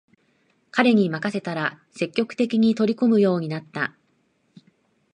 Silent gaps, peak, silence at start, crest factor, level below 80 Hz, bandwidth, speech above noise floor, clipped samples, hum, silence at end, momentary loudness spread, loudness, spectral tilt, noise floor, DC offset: none; -4 dBFS; 0.75 s; 20 dB; -70 dBFS; 9.8 kHz; 45 dB; under 0.1%; none; 1.25 s; 10 LU; -22 LUFS; -7 dB/octave; -67 dBFS; under 0.1%